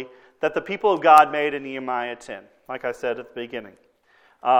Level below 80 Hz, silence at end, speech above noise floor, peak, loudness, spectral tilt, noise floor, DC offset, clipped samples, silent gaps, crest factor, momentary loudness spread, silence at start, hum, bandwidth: -66 dBFS; 0 s; 37 dB; 0 dBFS; -21 LUFS; -4.5 dB/octave; -59 dBFS; under 0.1%; under 0.1%; none; 22 dB; 22 LU; 0 s; none; 15.5 kHz